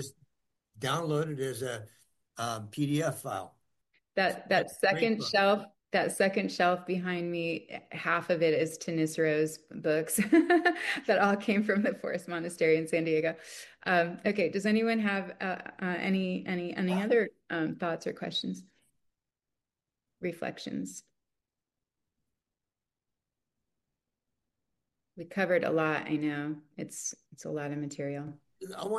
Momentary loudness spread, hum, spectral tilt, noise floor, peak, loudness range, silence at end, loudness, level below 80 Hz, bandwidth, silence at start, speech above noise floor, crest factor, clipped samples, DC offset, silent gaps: 13 LU; none; -5 dB/octave; under -90 dBFS; -12 dBFS; 15 LU; 0 s; -30 LUFS; -74 dBFS; 12.5 kHz; 0 s; over 60 dB; 20 dB; under 0.1%; under 0.1%; none